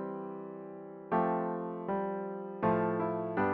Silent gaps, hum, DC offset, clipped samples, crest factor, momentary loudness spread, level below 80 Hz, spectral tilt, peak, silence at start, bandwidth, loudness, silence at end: none; none; under 0.1%; under 0.1%; 16 dB; 14 LU; -68 dBFS; -7.5 dB/octave; -18 dBFS; 0 s; 4.5 kHz; -34 LUFS; 0 s